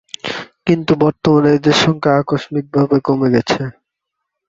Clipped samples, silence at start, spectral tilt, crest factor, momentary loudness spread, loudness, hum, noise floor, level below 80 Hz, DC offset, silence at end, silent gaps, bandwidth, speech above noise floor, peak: under 0.1%; 0.25 s; -6 dB/octave; 14 dB; 11 LU; -15 LUFS; none; -78 dBFS; -50 dBFS; under 0.1%; 0.75 s; none; 8 kHz; 64 dB; -2 dBFS